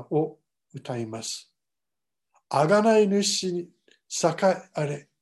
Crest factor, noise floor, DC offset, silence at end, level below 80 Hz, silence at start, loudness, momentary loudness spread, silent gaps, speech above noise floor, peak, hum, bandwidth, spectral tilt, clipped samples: 18 dB; -90 dBFS; under 0.1%; 0.2 s; -74 dBFS; 0 s; -25 LUFS; 15 LU; none; 65 dB; -8 dBFS; none; 12.5 kHz; -4.5 dB/octave; under 0.1%